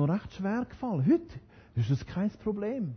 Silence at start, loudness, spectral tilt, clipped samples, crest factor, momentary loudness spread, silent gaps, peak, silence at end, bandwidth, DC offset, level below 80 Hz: 0 s; -31 LUFS; -9 dB/octave; under 0.1%; 14 dB; 9 LU; none; -16 dBFS; 0 s; 6.6 kHz; under 0.1%; -54 dBFS